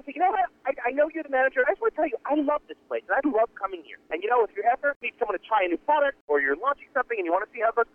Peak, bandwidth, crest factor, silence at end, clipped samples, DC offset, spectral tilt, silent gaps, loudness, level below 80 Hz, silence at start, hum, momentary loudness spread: -10 dBFS; 3.6 kHz; 16 dB; 0.1 s; under 0.1%; under 0.1%; -5.5 dB/octave; 4.96-5.01 s, 6.21-6.28 s; -26 LUFS; -64 dBFS; 0.05 s; none; 7 LU